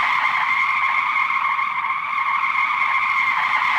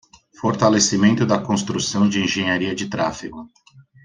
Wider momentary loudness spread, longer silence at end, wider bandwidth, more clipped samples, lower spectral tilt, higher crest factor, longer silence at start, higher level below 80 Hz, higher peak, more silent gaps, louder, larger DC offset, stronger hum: second, 3 LU vs 10 LU; second, 0 s vs 0.25 s; first, over 20 kHz vs 9.8 kHz; neither; second, -1 dB/octave vs -4 dB/octave; second, 12 dB vs 18 dB; second, 0 s vs 0.4 s; second, -66 dBFS vs -54 dBFS; second, -8 dBFS vs -2 dBFS; neither; about the same, -19 LUFS vs -19 LUFS; neither; neither